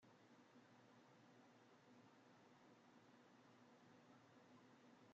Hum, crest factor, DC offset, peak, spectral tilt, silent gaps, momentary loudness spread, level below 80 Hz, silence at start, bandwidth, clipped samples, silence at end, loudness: none; 12 dB; under 0.1%; -58 dBFS; -4 dB/octave; none; 0 LU; under -90 dBFS; 0 s; 7.4 kHz; under 0.1%; 0 s; -70 LUFS